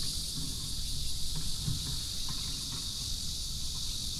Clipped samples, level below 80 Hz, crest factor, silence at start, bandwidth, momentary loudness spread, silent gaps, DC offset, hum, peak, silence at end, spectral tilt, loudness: under 0.1%; -40 dBFS; 14 dB; 0 s; 15.5 kHz; 1 LU; none; under 0.1%; none; -20 dBFS; 0 s; -2 dB/octave; -35 LUFS